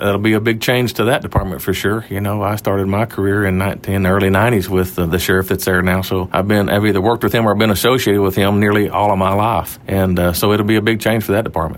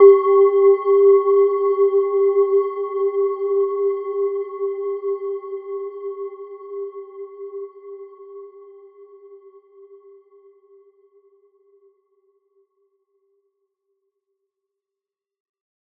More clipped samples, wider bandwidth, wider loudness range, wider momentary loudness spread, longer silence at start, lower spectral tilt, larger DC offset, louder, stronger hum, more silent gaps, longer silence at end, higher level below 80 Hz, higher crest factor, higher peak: neither; first, 16.5 kHz vs 3.3 kHz; second, 3 LU vs 23 LU; second, 5 LU vs 23 LU; about the same, 0 s vs 0 s; second, -5.5 dB/octave vs -8.5 dB/octave; neither; first, -15 LUFS vs -18 LUFS; neither; neither; second, 0 s vs 6.65 s; first, -38 dBFS vs under -90 dBFS; second, 12 dB vs 20 dB; about the same, -2 dBFS vs -2 dBFS